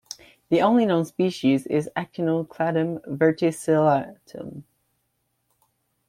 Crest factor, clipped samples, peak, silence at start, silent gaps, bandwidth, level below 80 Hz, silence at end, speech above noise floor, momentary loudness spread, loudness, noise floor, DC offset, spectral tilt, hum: 18 dB; under 0.1%; -6 dBFS; 0.1 s; none; 15.5 kHz; -66 dBFS; 1.45 s; 51 dB; 19 LU; -23 LUFS; -73 dBFS; under 0.1%; -6.5 dB/octave; none